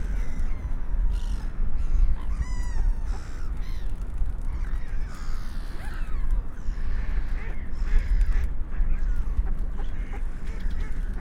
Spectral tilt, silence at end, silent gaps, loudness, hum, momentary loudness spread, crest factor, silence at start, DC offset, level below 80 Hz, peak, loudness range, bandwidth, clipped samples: -6.5 dB/octave; 0 s; none; -33 LUFS; none; 8 LU; 14 dB; 0 s; under 0.1%; -26 dBFS; -8 dBFS; 3 LU; 7 kHz; under 0.1%